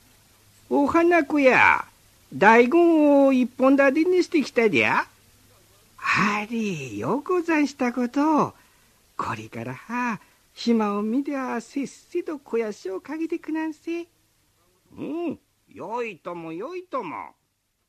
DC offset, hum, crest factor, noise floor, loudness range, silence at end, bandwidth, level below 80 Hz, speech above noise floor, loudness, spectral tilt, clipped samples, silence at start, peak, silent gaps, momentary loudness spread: under 0.1%; none; 20 dB; -72 dBFS; 14 LU; 0.6 s; 14 kHz; -64 dBFS; 50 dB; -22 LUFS; -5.5 dB/octave; under 0.1%; 0.7 s; -2 dBFS; none; 17 LU